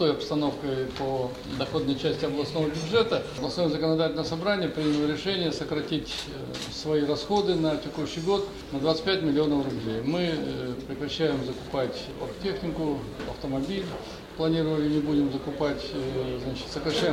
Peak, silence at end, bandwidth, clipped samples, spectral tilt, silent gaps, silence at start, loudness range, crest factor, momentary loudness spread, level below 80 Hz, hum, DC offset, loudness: -10 dBFS; 0 s; 15.5 kHz; under 0.1%; -6 dB/octave; none; 0 s; 4 LU; 18 dB; 8 LU; -50 dBFS; none; under 0.1%; -28 LUFS